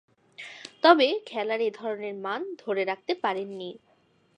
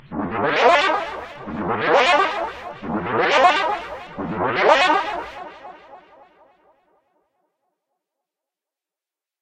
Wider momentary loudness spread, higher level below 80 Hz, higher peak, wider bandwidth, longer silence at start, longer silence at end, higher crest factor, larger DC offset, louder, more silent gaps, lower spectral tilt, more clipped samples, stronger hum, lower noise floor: first, 21 LU vs 17 LU; second, -84 dBFS vs -54 dBFS; about the same, -4 dBFS vs -2 dBFS; about the same, 10 kHz vs 10 kHz; first, 0.4 s vs 0.1 s; second, 0.6 s vs 3.45 s; about the same, 24 dB vs 20 dB; neither; second, -26 LUFS vs -19 LUFS; neither; about the same, -4.5 dB/octave vs -4 dB/octave; neither; neither; second, -46 dBFS vs -89 dBFS